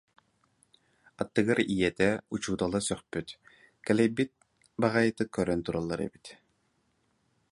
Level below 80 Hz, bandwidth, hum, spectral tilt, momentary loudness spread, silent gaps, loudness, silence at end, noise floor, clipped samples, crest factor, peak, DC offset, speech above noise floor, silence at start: -58 dBFS; 11.5 kHz; none; -5.5 dB/octave; 14 LU; none; -30 LUFS; 1.15 s; -73 dBFS; under 0.1%; 22 dB; -10 dBFS; under 0.1%; 44 dB; 1.2 s